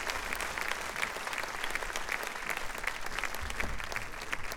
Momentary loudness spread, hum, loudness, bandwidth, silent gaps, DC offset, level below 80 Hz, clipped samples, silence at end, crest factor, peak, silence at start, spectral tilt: 3 LU; none; -36 LUFS; over 20 kHz; none; under 0.1%; -48 dBFS; under 0.1%; 0 s; 22 dB; -12 dBFS; 0 s; -1.5 dB/octave